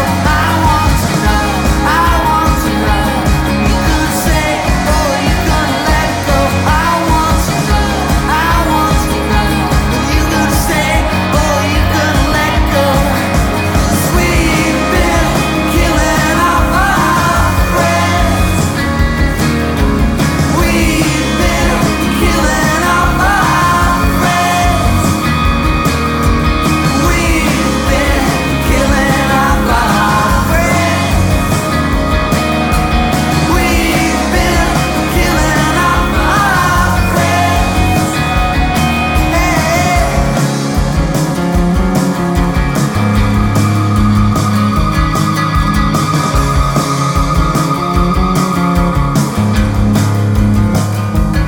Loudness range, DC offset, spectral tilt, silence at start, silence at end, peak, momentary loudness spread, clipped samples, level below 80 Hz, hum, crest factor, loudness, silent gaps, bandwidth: 1 LU; under 0.1%; -5 dB/octave; 0 s; 0 s; 0 dBFS; 2 LU; under 0.1%; -18 dBFS; none; 10 dB; -12 LUFS; none; 18 kHz